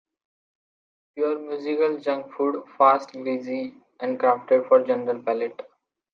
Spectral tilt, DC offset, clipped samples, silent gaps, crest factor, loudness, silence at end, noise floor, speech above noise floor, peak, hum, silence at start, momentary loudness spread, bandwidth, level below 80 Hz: -6.5 dB/octave; under 0.1%; under 0.1%; none; 20 dB; -24 LUFS; 0.5 s; under -90 dBFS; over 67 dB; -6 dBFS; none; 1.15 s; 13 LU; 6.6 kHz; -82 dBFS